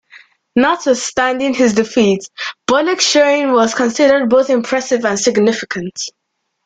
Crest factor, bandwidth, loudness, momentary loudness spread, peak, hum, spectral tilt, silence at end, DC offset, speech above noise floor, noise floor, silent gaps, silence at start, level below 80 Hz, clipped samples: 14 dB; 9.4 kHz; -14 LUFS; 10 LU; -2 dBFS; none; -3.5 dB/octave; 0.55 s; under 0.1%; 31 dB; -45 dBFS; none; 0.15 s; -54 dBFS; under 0.1%